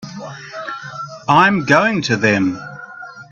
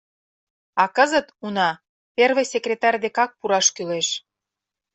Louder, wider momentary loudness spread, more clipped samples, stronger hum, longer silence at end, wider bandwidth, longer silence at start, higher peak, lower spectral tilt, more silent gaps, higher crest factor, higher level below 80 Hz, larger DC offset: first, -14 LUFS vs -21 LUFS; first, 20 LU vs 10 LU; neither; neither; second, 0.1 s vs 0.75 s; about the same, 8.2 kHz vs 8.4 kHz; second, 0 s vs 0.75 s; about the same, 0 dBFS vs -2 dBFS; first, -5.5 dB/octave vs -1.5 dB/octave; second, none vs 1.89-2.15 s; about the same, 18 dB vs 20 dB; first, -56 dBFS vs -70 dBFS; neither